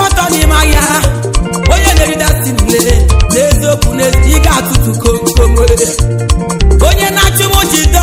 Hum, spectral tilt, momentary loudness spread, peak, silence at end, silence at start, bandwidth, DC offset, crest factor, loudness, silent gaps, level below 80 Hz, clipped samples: none; -4 dB/octave; 4 LU; 0 dBFS; 0 s; 0 s; 16.5 kHz; under 0.1%; 8 dB; -9 LUFS; none; -12 dBFS; 2%